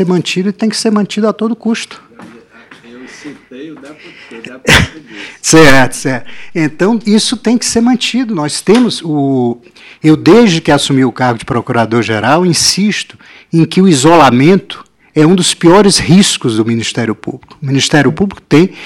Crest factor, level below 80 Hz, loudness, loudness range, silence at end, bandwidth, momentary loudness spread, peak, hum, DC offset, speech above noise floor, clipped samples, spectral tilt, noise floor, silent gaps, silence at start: 10 dB; -36 dBFS; -10 LUFS; 8 LU; 0 s; 16.5 kHz; 20 LU; 0 dBFS; none; under 0.1%; 28 dB; 1%; -4.5 dB/octave; -38 dBFS; none; 0 s